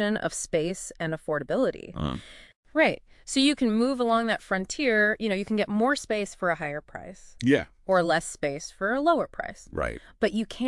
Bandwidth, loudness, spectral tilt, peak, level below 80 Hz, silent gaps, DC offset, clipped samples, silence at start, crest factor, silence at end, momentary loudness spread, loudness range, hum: 12 kHz; -27 LUFS; -4.5 dB/octave; -8 dBFS; -50 dBFS; 2.56-2.63 s; under 0.1%; under 0.1%; 0 s; 20 dB; 0 s; 10 LU; 3 LU; none